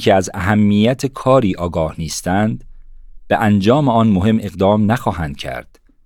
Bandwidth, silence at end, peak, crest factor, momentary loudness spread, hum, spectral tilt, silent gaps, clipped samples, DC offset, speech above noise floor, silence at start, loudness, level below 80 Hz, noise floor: 14.5 kHz; 0.45 s; -2 dBFS; 14 dB; 11 LU; none; -6.5 dB/octave; none; under 0.1%; under 0.1%; 21 dB; 0 s; -16 LUFS; -40 dBFS; -36 dBFS